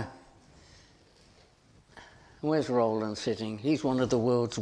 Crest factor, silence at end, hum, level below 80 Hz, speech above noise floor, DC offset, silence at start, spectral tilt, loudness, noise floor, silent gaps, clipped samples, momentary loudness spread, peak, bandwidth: 18 dB; 0 s; none; -62 dBFS; 32 dB; under 0.1%; 0 s; -6 dB/octave; -29 LUFS; -61 dBFS; none; under 0.1%; 6 LU; -14 dBFS; 10.5 kHz